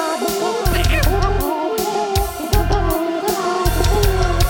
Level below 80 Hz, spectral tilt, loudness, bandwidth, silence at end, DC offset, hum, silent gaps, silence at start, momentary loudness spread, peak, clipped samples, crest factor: -22 dBFS; -5 dB/octave; -18 LUFS; over 20 kHz; 0 s; under 0.1%; none; none; 0 s; 3 LU; -4 dBFS; under 0.1%; 12 dB